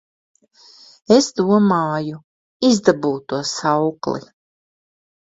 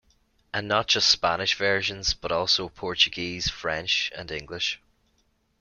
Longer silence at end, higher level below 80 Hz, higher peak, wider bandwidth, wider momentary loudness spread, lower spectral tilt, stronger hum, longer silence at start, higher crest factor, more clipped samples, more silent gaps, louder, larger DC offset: first, 1.2 s vs 0.85 s; second, -60 dBFS vs -50 dBFS; first, 0 dBFS vs -4 dBFS; second, 8 kHz vs 13 kHz; about the same, 11 LU vs 12 LU; first, -5 dB/octave vs -2 dB/octave; neither; first, 1.1 s vs 0.55 s; about the same, 20 dB vs 22 dB; neither; first, 2.24-2.60 s vs none; first, -18 LUFS vs -24 LUFS; neither